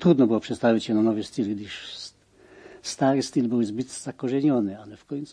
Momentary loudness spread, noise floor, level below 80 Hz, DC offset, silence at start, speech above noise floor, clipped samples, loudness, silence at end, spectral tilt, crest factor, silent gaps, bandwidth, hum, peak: 14 LU; -54 dBFS; -64 dBFS; under 0.1%; 0 s; 30 dB; under 0.1%; -25 LUFS; 0 s; -6 dB/octave; 18 dB; none; 10.5 kHz; none; -6 dBFS